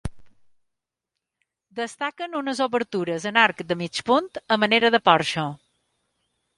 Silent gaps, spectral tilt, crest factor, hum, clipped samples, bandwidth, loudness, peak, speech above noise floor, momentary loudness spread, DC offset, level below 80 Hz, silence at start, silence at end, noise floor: none; -4 dB/octave; 22 dB; none; under 0.1%; 11.5 kHz; -22 LUFS; -2 dBFS; 62 dB; 14 LU; under 0.1%; -52 dBFS; 0.05 s; 1 s; -85 dBFS